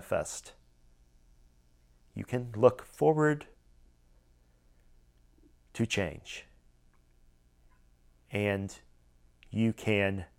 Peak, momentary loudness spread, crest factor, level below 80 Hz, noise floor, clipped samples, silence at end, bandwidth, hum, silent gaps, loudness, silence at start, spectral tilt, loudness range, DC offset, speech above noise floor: -8 dBFS; 20 LU; 26 dB; -60 dBFS; -64 dBFS; under 0.1%; 0.15 s; 16.5 kHz; 60 Hz at -60 dBFS; none; -31 LUFS; 0 s; -6 dB/octave; 8 LU; under 0.1%; 34 dB